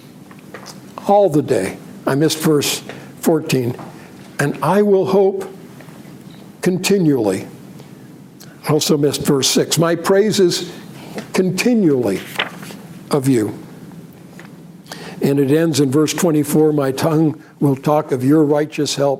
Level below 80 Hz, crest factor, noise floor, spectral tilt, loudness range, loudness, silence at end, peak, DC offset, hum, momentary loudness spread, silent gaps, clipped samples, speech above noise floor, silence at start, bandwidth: -60 dBFS; 16 dB; -39 dBFS; -5 dB/octave; 4 LU; -16 LUFS; 0 s; -2 dBFS; under 0.1%; none; 21 LU; none; under 0.1%; 24 dB; 0.15 s; 16.5 kHz